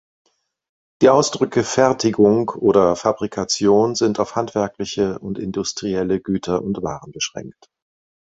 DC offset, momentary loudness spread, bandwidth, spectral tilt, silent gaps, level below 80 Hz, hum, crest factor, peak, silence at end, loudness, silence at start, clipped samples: under 0.1%; 11 LU; 8 kHz; -5 dB/octave; none; -52 dBFS; none; 18 dB; -2 dBFS; 0.85 s; -19 LUFS; 1 s; under 0.1%